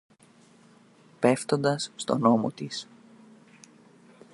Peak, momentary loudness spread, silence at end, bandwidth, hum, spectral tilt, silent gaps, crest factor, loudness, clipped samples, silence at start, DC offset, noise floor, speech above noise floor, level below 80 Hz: -8 dBFS; 13 LU; 1.5 s; 11.5 kHz; none; -5.5 dB/octave; none; 22 dB; -26 LUFS; under 0.1%; 1.2 s; under 0.1%; -57 dBFS; 32 dB; -74 dBFS